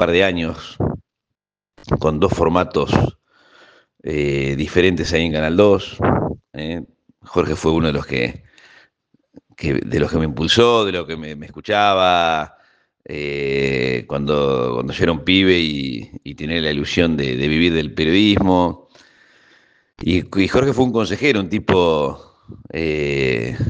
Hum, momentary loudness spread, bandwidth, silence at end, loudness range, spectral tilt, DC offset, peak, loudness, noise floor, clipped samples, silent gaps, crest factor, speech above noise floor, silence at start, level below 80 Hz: none; 13 LU; 9.6 kHz; 0 s; 3 LU; -6 dB/octave; under 0.1%; 0 dBFS; -18 LUFS; -82 dBFS; under 0.1%; none; 18 dB; 65 dB; 0 s; -40 dBFS